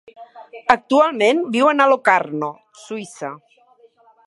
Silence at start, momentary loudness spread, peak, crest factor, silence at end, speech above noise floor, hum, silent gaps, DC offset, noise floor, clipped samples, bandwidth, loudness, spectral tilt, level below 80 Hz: 0.2 s; 17 LU; 0 dBFS; 20 dB; 0.9 s; 36 dB; none; none; under 0.1%; -53 dBFS; under 0.1%; 11.5 kHz; -17 LUFS; -4.5 dB/octave; -62 dBFS